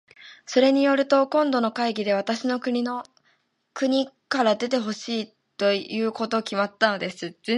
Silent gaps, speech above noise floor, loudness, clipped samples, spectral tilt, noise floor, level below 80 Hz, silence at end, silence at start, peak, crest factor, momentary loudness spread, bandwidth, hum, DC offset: none; 44 dB; -24 LUFS; under 0.1%; -4.5 dB/octave; -67 dBFS; -76 dBFS; 0 s; 0.2 s; -4 dBFS; 20 dB; 10 LU; 11.5 kHz; none; under 0.1%